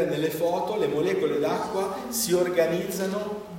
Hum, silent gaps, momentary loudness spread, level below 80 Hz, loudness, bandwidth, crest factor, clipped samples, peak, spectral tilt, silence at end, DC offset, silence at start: none; none; 5 LU; -62 dBFS; -26 LUFS; 16.5 kHz; 16 dB; under 0.1%; -10 dBFS; -4.5 dB/octave; 0 s; under 0.1%; 0 s